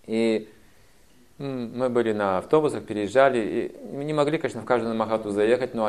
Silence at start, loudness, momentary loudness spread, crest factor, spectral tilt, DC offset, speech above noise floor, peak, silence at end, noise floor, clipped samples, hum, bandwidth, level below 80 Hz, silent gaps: 0.1 s; -24 LUFS; 11 LU; 20 dB; -6 dB/octave; 0.2%; 34 dB; -4 dBFS; 0 s; -58 dBFS; under 0.1%; none; 13 kHz; -62 dBFS; none